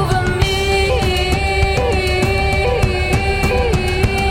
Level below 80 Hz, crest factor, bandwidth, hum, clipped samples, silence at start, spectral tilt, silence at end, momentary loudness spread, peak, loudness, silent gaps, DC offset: -22 dBFS; 12 dB; 16.5 kHz; none; under 0.1%; 0 s; -5 dB/octave; 0 s; 2 LU; -4 dBFS; -16 LUFS; none; under 0.1%